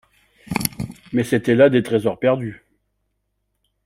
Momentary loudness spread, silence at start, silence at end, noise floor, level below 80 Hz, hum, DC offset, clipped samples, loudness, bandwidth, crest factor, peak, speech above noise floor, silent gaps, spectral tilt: 13 LU; 0.5 s; 1.3 s; -72 dBFS; -52 dBFS; 50 Hz at -55 dBFS; under 0.1%; under 0.1%; -19 LUFS; 16 kHz; 22 dB; 0 dBFS; 55 dB; none; -6 dB/octave